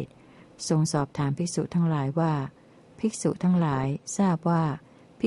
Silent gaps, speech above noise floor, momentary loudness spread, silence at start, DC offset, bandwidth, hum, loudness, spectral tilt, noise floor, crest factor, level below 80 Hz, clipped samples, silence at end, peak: none; 27 dB; 7 LU; 0 s; under 0.1%; 11.5 kHz; none; -27 LUFS; -6.5 dB/octave; -52 dBFS; 14 dB; -60 dBFS; under 0.1%; 0 s; -12 dBFS